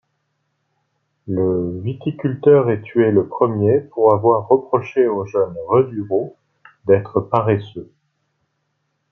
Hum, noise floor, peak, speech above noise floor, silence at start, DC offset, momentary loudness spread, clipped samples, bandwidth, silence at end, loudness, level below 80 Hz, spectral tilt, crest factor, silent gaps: none; -71 dBFS; -2 dBFS; 54 dB; 1.25 s; under 0.1%; 11 LU; under 0.1%; 6 kHz; 1.3 s; -18 LUFS; -60 dBFS; -10 dB/octave; 18 dB; none